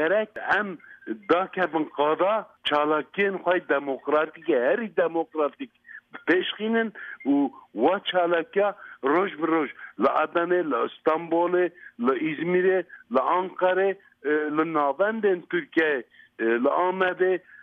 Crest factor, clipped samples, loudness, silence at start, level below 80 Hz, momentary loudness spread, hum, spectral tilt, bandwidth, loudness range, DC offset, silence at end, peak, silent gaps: 16 dB; under 0.1%; -25 LUFS; 0 s; -74 dBFS; 6 LU; none; -7.5 dB/octave; 5.4 kHz; 1 LU; under 0.1%; 0.25 s; -10 dBFS; none